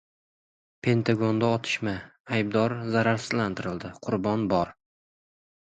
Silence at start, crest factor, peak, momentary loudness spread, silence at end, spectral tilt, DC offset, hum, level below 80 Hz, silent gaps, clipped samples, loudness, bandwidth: 0.85 s; 20 dB; -8 dBFS; 9 LU; 1.05 s; -6.5 dB/octave; under 0.1%; none; -58 dBFS; 2.20-2.25 s; under 0.1%; -27 LUFS; 9.2 kHz